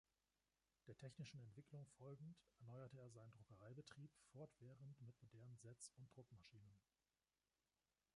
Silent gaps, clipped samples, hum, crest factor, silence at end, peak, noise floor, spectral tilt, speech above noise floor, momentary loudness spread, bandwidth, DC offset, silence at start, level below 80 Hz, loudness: none; under 0.1%; none; 18 dB; 1.35 s; -46 dBFS; under -90 dBFS; -5.5 dB/octave; over 27 dB; 7 LU; 11 kHz; under 0.1%; 0.85 s; -88 dBFS; -63 LUFS